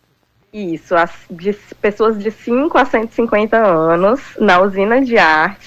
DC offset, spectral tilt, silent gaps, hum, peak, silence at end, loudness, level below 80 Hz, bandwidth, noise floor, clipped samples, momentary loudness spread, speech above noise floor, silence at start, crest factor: under 0.1%; -6 dB/octave; none; none; -2 dBFS; 0.1 s; -14 LUFS; -48 dBFS; 13.5 kHz; -59 dBFS; under 0.1%; 11 LU; 45 dB; 0.55 s; 12 dB